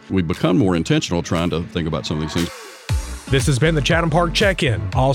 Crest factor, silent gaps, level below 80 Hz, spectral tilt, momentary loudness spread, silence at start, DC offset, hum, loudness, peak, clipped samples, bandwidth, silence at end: 12 dB; none; -32 dBFS; -5.5 dB/octave; 9 LU; 0.05 s; under 0.1%; none; -19 LUFS; -6 dBFS; under 0.1%; 16 kHz; 0 s